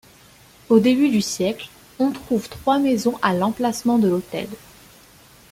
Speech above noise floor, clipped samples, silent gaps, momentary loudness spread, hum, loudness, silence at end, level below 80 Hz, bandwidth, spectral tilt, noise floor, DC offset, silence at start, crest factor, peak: 30 dB; under 0.1%; none; 13 LU; none; -20 LUFS; 0.95 s; -56 dBFS; 16.5 kHz; -5.5 dB/octave; -49 dBFS; under 0.1%; 0.7 s; 18 dB; -2 dBFS